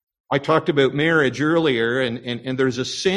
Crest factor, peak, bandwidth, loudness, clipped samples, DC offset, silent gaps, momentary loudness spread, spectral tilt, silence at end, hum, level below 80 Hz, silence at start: 16 dB; -4 dBFS; 11 kHz; -20 LUFS; under 0.1%; under 0.1%; none; 7 LU; -5 dB/octave; 0 s; none; -56 dBFS; 0.3 s